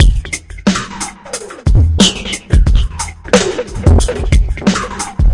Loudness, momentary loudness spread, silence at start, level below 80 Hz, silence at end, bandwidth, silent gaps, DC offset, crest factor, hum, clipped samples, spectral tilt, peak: -14 LUFS; 12 LU; 0 s; -16 dBFS; 0 s; 11.5 kHz; none; under 0.1%; 12 dB; none; under 0.1%; -4.5 dB/octave; 0 dBFS